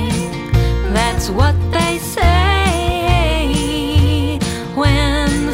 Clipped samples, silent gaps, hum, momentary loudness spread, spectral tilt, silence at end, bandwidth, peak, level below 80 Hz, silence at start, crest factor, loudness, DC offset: under 0.1%; none; none; 4 LU; -5.5 dB/octave; 0 s; 16.5 kHz; 0 dBFS; -20 dBFS; 0 s; 14 dB; -16 LUFS; under 0.1%